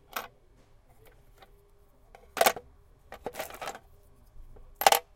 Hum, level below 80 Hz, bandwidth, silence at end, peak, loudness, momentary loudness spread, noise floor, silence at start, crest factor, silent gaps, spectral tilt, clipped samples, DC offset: none; -56 dBFS; 17 kHz; 0.15 s; -2 dBFS; -30 LUFS; 25 LU; -59 dBFS; 0.15 s; 32 dB; none; -0.5 dB/octave; under 0.1%; under 0.1%